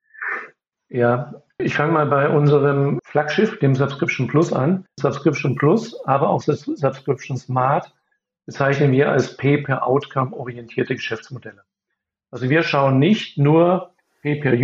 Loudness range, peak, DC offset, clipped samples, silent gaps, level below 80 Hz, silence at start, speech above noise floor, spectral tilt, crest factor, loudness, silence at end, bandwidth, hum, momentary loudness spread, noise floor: 3 LU; -2 dBFS; under 0.1%; under 0.1%; none; -66 dBFS; 0.2 s; 61 dB; -7.5 dB/octave; 18 dB; -19 LUFS; 0 s; 7.6 kHz; none; 11 LU; -80 dBFS